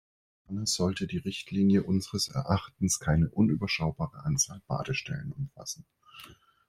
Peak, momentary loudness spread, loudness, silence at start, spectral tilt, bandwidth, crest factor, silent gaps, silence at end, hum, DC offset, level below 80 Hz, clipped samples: -10 dBFS; 15 LU; -30 LUFS; 0.5 s; -4.5 dB/octave; 16 kHz; 20 dB; none; 0.35 s; none; under 0.1%; -52 dBFS; under 0.1%